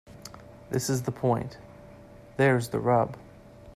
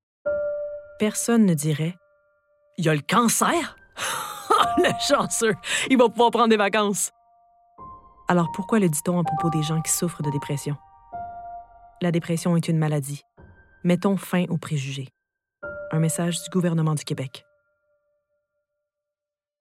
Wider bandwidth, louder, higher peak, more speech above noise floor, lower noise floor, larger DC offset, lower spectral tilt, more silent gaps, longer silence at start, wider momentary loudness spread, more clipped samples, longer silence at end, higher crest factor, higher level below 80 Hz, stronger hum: about the same, 15.5 kHz vs 16 kHz; second, -27 LUFS vs -23 LUFS; second, -10 dBFS vs -4 dBFS; second, 23 dB vs 67 dB; second, -49 dBFS vs -89 dBFS; neither; about the same, -6 dB/octave vs -5 dB/octave; neither; second, 0.1 s vs 0.25 s; first, 22 LU vs 17 LU; neither; second, 0 s vs 2.2 s; about the same, 18 dB vs 20 dB; about the same, -58 dBFS vs -60 dBFS; neither